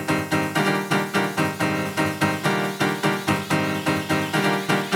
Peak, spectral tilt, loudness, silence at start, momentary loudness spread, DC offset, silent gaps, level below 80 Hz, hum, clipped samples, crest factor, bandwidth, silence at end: -4 dBFS; -4.5 dB/octave; -22 LUFS; 0 s; 2 LU; under 0.1%; none; -60 dBFS; none; under 0.1%; 18 dB; over 20 kHz; 0 s